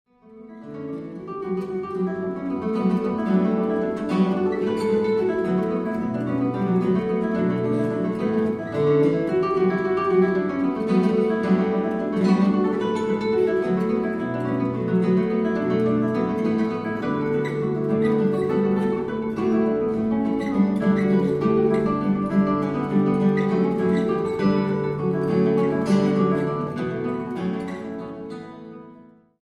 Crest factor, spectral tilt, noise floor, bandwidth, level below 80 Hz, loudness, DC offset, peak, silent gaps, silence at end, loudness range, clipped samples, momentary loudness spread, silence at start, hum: 14 dB; -9 dB/octave; -49 dBFS; 9.4 kHz; -54 dBFS; -22 LUFS; under 0.1%; -8 dBFS; none; 0.4 s; 3 LU; under 0.1%; 8 LU; 0.3 s; none